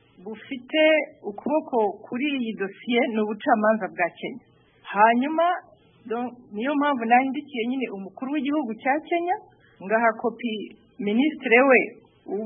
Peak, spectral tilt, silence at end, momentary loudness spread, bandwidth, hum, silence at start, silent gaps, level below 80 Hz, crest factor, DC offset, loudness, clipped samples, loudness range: -4 dBFS; -9.5 dB/octave; 0 s; 15 LU; 3.7 kHz; none; 0.2 s; none; -76 dBFS; 20 dB; under 0.1%; -24 LUFS; under 0.1%; 3 LU